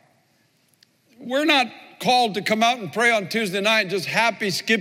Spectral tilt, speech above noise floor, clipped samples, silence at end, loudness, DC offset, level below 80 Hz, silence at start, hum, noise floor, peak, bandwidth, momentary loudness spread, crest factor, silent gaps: -3 dB/octave; 42 dB; under 0.1%; 0 s; -20 LUFS; under 0.1%; -78 dBFS; 1.2 s; none; -63 dBFS; -6 dBFS; 16.5 kHz; 7 LU; 18 dB; none